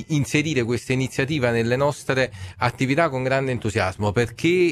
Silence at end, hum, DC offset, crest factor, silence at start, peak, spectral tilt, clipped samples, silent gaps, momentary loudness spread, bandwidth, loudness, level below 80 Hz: 0 s; none; under 0.1%; 18 dB; 0 s; -4 dBFS; -5.5 dB/octave; under 0.1%; none; 3 LU; 14 kHz; -22 LUFS; -50 dBFS